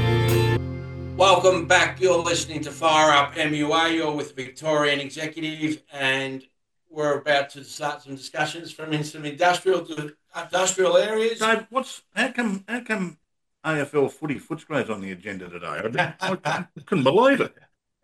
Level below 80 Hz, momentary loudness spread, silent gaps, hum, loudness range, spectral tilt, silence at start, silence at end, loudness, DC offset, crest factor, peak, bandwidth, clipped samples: -52 dBFS; 15 LU; none; none; 8 LU; -4 dB/octave; 0 s; 0.55 s; -23 LUFS; under 0.1%; 20 dB; -4 dBFS; 13 kHz; under 0.1%